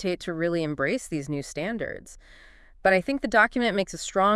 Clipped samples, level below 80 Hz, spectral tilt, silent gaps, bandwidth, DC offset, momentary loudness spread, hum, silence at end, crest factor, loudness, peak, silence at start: under 0.1%; -52 dBFS; -4.5 dB/octave; none; 12 kHz; under 0.1%; 11 LU; none; 0 s; 20 dB; -26 LUFS; -6 dBFS; 0 s